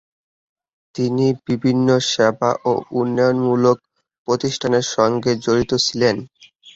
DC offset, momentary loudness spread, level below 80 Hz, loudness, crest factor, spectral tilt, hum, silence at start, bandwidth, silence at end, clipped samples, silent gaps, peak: under 0.1%; 6 LU; -54 dBFS; -18 LUFS; 16 dB; -5 dB/octave; none; 0.95 s; 8 kHz; 0.05 s; under 0.1%; 4.18-4.25 s; -2 dBFS